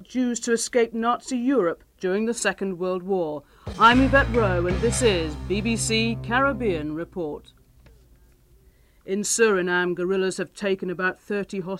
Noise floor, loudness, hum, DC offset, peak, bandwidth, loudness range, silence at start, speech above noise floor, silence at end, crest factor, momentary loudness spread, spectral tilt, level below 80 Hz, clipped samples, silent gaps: -56 dBFS; -23 LUFS; none; under 0.1%; -4 dBFS; 15.5 kHz; 6 LU; 0 s; 33 dB; 0 s; 20 dB; 12 LU; -4.5 dB/octave; -40 dBFS; under 0.1%; none